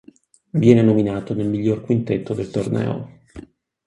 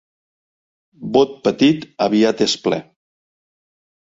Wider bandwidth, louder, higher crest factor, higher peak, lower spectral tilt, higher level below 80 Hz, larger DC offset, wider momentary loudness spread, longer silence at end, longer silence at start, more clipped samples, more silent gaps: first, 11 kHz vs 7.8 kHz; about the same, -19 LUFS vs -17 LUFS; about the same, 20 dB vs 18 dB; about the same, 0 dBFS vs -2 dBFS; first, -8.5 dB/octave vs -5 dB/octave; first, -50 dBFS vs -60 dBFS; neither; first, 12 LU vs 7 LU; second, 0.45 s vs 1.3 s; second, 0.55 s vs 1 s; neither; neither